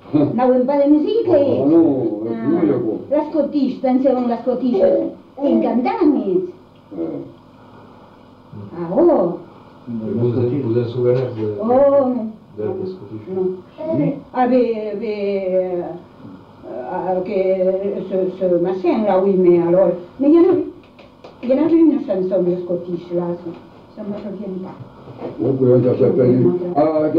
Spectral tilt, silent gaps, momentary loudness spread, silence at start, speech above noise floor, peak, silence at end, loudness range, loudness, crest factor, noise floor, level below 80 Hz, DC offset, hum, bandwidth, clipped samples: -10.5 dB/octave; none; 16 LU; 0.05 s; 27 dB; -4 dBFS; 0 s; 6 LU; -17 LUFS; 14 dB; -44 dBFS; -56 dBFS; under 0.1%; none; 5.2 kHz; under 0.1%